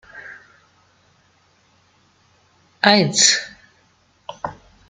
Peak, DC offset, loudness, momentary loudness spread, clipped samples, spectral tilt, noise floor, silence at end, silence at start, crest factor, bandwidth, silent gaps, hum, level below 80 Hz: 0 dBFS; under 0.1%; -15 LUFS; 26 LU; under 0.1%; -2 dB/octave; -59 dBFS; 0.35 s; 0.15 s; 24 dB; 9.6 kHz; none; none; -62 dBFS